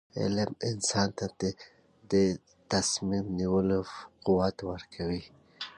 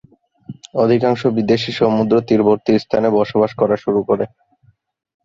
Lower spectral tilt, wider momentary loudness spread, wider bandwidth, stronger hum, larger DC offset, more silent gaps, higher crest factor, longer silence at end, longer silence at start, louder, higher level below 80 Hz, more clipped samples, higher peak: second, -4.5 dB/octave vs -7.5 dB/octave; first, 12 LU vs 5 LU; first, 11.5 kHz vs 7.6 kHz; neither; neither; neither; about the same, 18 dB vs 16 dB; second, 0.05 s vs 1 s; second, 0.15 s vs 0.5 s; second, -30 LUFS vs -16 LUFS; about the same, -54 dBFS vs -54 dBFS; neither; second, -12 dBFS vs -2 dBFS